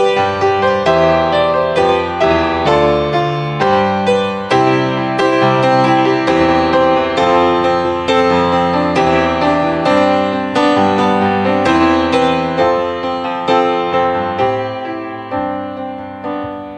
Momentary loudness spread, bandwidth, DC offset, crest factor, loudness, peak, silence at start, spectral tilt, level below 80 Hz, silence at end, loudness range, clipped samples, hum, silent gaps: 8 LU; 9.8 kHz; under 0.1%; 12 dB; -13 LUFS; 0 dBFS; 0 s; -6 dB/octave; -40 dBFS; 0 s; 4 LU; under 0.1%; none; none